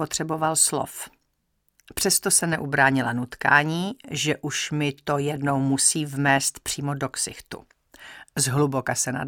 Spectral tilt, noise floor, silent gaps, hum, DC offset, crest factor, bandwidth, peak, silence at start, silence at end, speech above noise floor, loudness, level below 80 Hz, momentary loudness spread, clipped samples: -3 dB/octave; -73 dBFS; none; none; under 0.1%; 22 dB; 19 kHz; -2 dBFS; 0 s; 0 s; 49 dB; -23 LUFS; -58 dBFS; 14 LU; under 0.1%